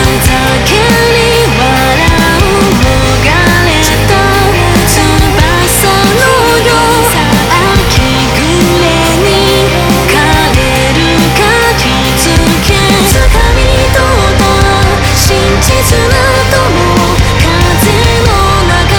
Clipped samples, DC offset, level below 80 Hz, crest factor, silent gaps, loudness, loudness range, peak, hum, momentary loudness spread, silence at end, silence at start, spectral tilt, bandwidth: 1%; under 0.1%; -16 dBFS; 6 dB; none; -7 LUFS; 1 LU; 0 dBFS; none; 2 LU; 0 s; 0 s; -4 dB/octave; over 20 kHz